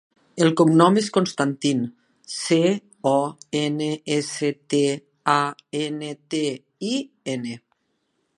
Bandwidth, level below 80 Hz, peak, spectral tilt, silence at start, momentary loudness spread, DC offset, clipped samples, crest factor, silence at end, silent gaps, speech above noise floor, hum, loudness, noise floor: 11.5 kHz; -72 dBFS; 0 dBFS; -5 dB/octave; 0.35 s; 13 LU; under 0.1%; under 0.1%; 22 dB; 0.8 s; none; 50 dB; none; -22 LUFS; -72 dBFS